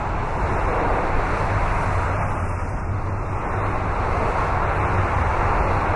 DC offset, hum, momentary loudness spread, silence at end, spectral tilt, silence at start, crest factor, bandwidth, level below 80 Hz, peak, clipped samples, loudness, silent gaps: under 0.1%; none; 5 LU; 0 s; -7 dB/octave; 0 s; 12 dB; 11 kHz; -28 dBFS; -8 dBFS; under 0.1%; -23 LUFS; none